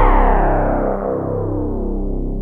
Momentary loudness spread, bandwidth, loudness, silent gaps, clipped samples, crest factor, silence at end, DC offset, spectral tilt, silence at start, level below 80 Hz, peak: 8 LU; 3.4 kHz; -19 LUFS; none; under 0.1%; 14 dB; 0 s; under 0.1%; -10.5 dB/octave; 0 s; -18 dBFS; -2 dBFS